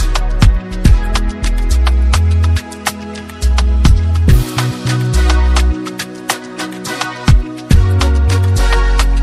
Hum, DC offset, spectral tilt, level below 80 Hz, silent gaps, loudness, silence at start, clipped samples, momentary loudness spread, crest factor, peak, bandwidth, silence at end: none; under 0.1%; -5.5 dB/octave; -14 dBFS; none; -14 LUFS; 0 s; 0.2%; 9 LU; 12 dB; 0 dBFS; 14.5 kHz; 0 s